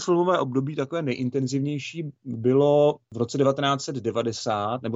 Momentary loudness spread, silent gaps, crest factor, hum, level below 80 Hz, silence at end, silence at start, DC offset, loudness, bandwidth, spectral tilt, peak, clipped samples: 10 LU; none; 14 dB; none; -68 dBFS; 0 s; 0 s; under 0.1%; -24 LUFS; 8 kHz; -6 dB/octave; -10 dBFS; under 0.1%